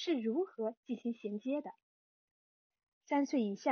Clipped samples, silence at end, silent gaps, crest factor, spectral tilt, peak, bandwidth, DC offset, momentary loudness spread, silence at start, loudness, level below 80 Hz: under 0.1%; 0 s; 0.77-0.83 s, 1.82-2.70 s, 2.88-3.01 s; 18 dB; -4.5 dB/octave; -18 dBFS; 6.6 kHz; under 0.1%; 7 LU; 0 s; -37 LUFS; under -90 dBFS